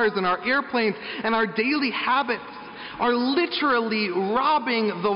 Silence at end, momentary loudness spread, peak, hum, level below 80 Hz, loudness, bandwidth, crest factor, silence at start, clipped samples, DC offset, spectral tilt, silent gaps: 0 s; 7 LU; -12 dBFS; none; -62 dBFS; -23 LUFS; 5.6 kHz; 12 dB; 0 s; under 0.1%; under 0.1%; -2 dB/octave; none